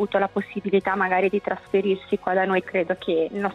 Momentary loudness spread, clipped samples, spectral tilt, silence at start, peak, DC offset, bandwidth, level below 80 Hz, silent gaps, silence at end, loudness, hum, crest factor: 4 LU; under 0.1%; -7.5 dB/octave; 0 s; -8 dBFS; under 0.1%; 5.8 kHz; -62 dBFS; none; 0 s; -23 LUFS; none; 14 dB